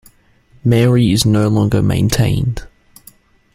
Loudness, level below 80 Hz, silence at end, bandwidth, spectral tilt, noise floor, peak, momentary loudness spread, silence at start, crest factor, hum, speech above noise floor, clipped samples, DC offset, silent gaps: -14 LUFS; -34 dBFS; 0.9 s; 16 kHz; -6 dB/octave; -50 dBFS; 0 dBFS; 8 LU; 0.65 s; 14 dB; none; 37 dB; under 0.1%; under 0.1%; none